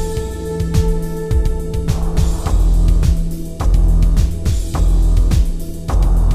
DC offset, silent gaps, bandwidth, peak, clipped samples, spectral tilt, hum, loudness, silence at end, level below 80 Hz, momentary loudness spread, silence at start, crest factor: under 0.1%; none; 13.5 kHz; -2 dBFS; under 0.1%; -7 dB/octave; none; -18 LUFS; 0 s; -14 dBFS; 7 LU; 0 s; 12 dB